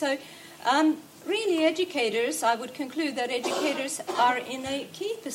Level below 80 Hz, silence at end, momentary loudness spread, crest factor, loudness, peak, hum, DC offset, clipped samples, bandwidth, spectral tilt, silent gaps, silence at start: -74 dBFS; 0 s; 10 LU; 18 dB; -27 LUFS; -10 dBFS; none; under 0.1%; under 0.1%; 16 kHz; -2.5 dB/octave; none; 0 s